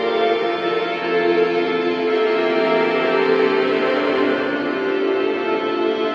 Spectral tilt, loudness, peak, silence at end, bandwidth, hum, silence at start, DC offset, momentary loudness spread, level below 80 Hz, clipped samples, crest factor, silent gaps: -6 dB/octave; -19 LUFS; -4 dBFS; 0 s; 7 kHz; none; 0 s; under 0.1%; 4 LU; -70 dBFS; under 0.1%; 14 dB; none